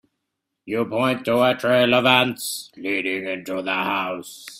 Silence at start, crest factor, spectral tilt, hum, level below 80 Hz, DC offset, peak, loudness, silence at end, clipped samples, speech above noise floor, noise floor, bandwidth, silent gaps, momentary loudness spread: 0.65 s; 20 dB; -4 dB/octave; none; -64 dBFS; under 0.1%; -2 dBFS; -21 LUFS; 0 s; under 0.1%; 58 dB; -80 dBFS; 16 kHz; none; 13 LU